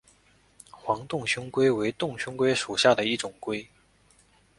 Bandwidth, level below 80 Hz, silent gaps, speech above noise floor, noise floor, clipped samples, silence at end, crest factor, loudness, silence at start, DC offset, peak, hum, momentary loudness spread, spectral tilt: 11.5 kHz; -64 dBFS; none; 35 dB; -62 dBFS; under 0.1%; 0.95 s; 22 dB; -26 LUFS; 0.75 s; under 0.1%; -6 dBFS; none; 12 LU; -4 dB/octave